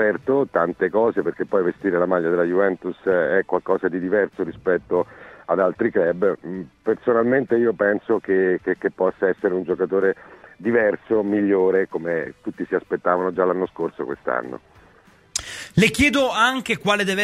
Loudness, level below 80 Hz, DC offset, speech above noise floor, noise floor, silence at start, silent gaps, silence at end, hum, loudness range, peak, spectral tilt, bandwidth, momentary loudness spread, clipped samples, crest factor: -21 LUFS; -52 dBFS; under 0.1%; 32 dB; -53 dBFS; 0 s; none; 0 s; none; 2 LU; -4 dBFS; -5 dB/octave; 14.5 kHz; 9 LU; under 0.1%; 18 dB